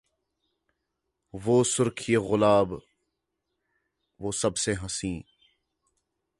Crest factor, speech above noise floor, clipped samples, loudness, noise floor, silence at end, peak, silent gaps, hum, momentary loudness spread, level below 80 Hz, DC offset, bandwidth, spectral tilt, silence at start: 22 dB; 56 dB; under 0.1%; -26 LUFS; -81 dBFS; 1.15 s; -8 dBFS; none; none; 15 LU; -54 dBFS; under 0.1%; 11.5 kHz; -4.5 dB/octave; 1.35 s